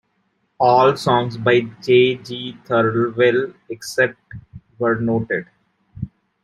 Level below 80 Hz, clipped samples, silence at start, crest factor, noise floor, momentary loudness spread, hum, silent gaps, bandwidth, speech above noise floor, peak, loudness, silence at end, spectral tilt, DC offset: -54 dBFS; under 0.1%; 0.6 s; 18 dB; -67 dBFS; 18 LU; none; none; 13 kHz; 49 dB; -2 dBFS; -18 LUFS; 0.35 s; -6 dB/octave; under 0.1%